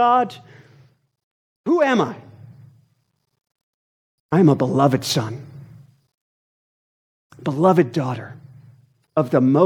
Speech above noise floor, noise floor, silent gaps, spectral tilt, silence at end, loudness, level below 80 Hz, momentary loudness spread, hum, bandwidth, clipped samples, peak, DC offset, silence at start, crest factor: 43 dB; -60 dBFS; 1.23-1.64 s, 3.63-4.29 s, 6.14-7.30 s; -6.5 dB/octave; 0 s; -19 LUFS; -68 dBFS; 18 LU; none; 17.5 kHz; under 0.1%; -2 dBFS; under 0.1%; 0 s; 20 dB